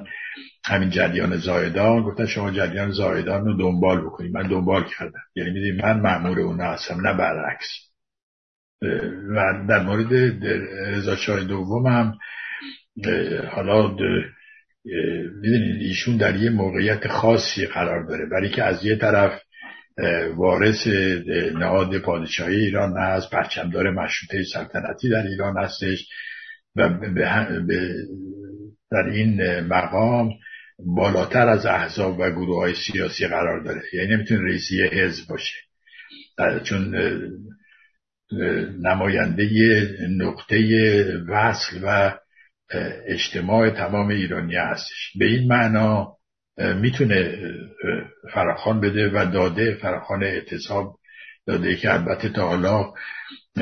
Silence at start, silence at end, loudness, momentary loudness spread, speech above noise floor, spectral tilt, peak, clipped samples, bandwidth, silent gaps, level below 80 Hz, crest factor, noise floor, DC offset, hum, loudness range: 0 s; 0 s; -22 LUFS; 12 LU; 41 dB; -6.5 dB/octave; -2 dBFS; under 0.1%; 6.6 kHz; 8.23-8.79 s; -54 dBFS; 20 dB; -63 dBFS; under 0.1%; none; 4 LU